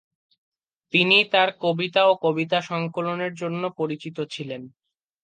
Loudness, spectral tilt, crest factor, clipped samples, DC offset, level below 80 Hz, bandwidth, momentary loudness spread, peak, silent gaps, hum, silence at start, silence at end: -22 LUFS; -5.5 dB/octave; 20 dB; under 0.1%; under 0.1%; -76 dBFS; 9.2 kHz; 15 LU; -4 dBFS; none; none; 0.95 s; 0.55 s